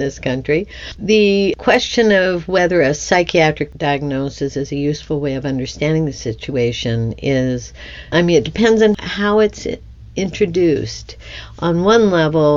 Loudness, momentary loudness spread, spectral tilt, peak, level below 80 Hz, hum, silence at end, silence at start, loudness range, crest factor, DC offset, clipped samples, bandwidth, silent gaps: -16 LUFS; 13 LU; -5.5 dB/octave; 0 dBFS; -38 dBFS; none; 0 s; 0 s; 5 LU; 16 dB; under 0.1%; under 0.1%; 7.6 kHz; none